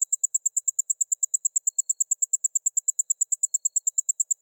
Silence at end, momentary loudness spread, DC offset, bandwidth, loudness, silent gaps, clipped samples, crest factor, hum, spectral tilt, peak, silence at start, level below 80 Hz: 0.1 s; 2 LU; under 0.1%; 18 kHz; -23 LUFS; none; under 0.1%; 14 dB; none; 7 dB/octave; -12 dBFS; 0 s; under -90 dBFS